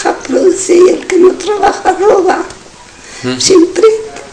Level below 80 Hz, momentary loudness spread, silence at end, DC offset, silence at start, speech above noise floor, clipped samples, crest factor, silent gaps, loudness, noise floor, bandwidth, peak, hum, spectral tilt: -44 dBFS; 11 LU; 0 s; under 0.1%; 0 s; 26 dB; 3%; 10 dB; none; -9 LUFS; -34 dBFS; 11 kHz; 0 dBFS; none; -3.5 dB/octave